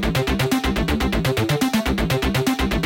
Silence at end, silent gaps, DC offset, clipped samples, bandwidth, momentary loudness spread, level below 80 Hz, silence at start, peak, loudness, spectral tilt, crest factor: 0 s; none; under 0.1%; under 0.1%; 17 kHz; 1 LU; -28 dBFS; 0 s; -8 dBFS; -21 LUFS; -5 dB/octave; 12 dB